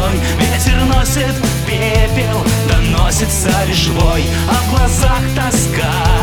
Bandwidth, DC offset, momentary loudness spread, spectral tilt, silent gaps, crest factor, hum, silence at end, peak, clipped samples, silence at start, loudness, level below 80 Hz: over 20 kHz; under 0.1%; 2 LU; -4.5 dB/octave; none; 12 dB; none; 0 s; 0 dBFS; under 0.1%; 0 s; -14 LUFS; -18 dBFS